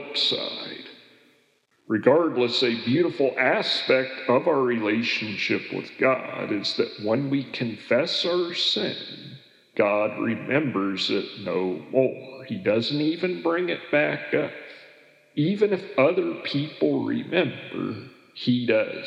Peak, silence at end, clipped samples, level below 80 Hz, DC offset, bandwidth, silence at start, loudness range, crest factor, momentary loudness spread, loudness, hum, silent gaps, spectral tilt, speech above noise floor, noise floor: -4 dBFS; 0 s; under 0.1%; -84 dBFS; under 0.1%; 10 kHz; 0 s; 3 LU; 20 dB; 11 LU; -24 LUFS; none; none; -5.5 dB/octave; 41 dB; -65 dBFS